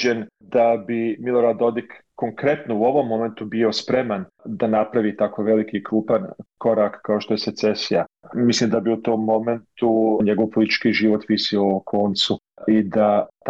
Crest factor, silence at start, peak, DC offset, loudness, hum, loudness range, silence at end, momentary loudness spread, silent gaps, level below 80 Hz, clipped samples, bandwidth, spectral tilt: 12 dB; 0 s; -8 dBFS; under 0.1%; -21 LUFS; none; 2 LU; 0 s; 7 LU; none; -62 dBFS; under 0.1%; 8 kHz; -5.5 dB/octave